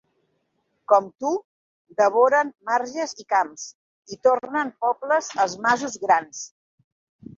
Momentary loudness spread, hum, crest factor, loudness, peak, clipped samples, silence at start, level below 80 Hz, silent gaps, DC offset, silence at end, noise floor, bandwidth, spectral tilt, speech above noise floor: 17 LU; none; 20 dB; -22 LUFS; -4 dBFS; under 0.1%; 0.9 s; -72 dBFS; 1.45-1.85 s, 3.75-4.03 s; under 0.1%; 0.9 s; -72 dBFS; 7.8 kHz; -3 dB/octave; 50 dB